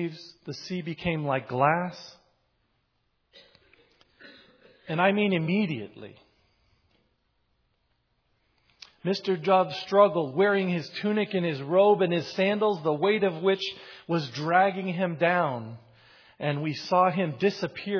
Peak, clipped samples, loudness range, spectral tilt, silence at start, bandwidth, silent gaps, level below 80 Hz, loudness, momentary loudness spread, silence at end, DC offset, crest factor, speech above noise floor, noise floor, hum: -6 dBFS; under 0.1%; 9 LU; -6.5 dB/octave; 0 s; 5.4 kHz; none; -66 dBFS; -26 LUFS; 13 LU; 0 s; under 0.1%; 20 dB; 48 dB; -74 dBFS; none